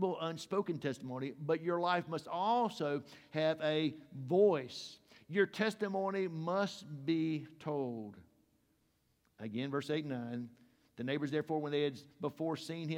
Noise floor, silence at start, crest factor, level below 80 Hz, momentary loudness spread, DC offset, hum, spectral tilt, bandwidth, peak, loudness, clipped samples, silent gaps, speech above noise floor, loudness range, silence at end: -76 dBFS; 0 s; 20 dB; -82 dBFS; 11 LU; under 0.1%; none; -6 dB/octave; 15.5 kHz; -18 dBFS; -37 LUFS; under 0.1%; none; 40 dB; 7 LU; 0 s